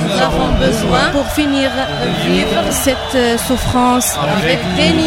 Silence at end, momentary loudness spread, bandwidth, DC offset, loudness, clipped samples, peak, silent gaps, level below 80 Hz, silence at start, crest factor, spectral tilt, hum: 0 s; 3 LU; 16.5 kHz; under 0.1%; -14 LUFS; under 0.1%; 0 dBFS; none; -28 dBFS; 0 s; 14 dB; -4 dB/octave; none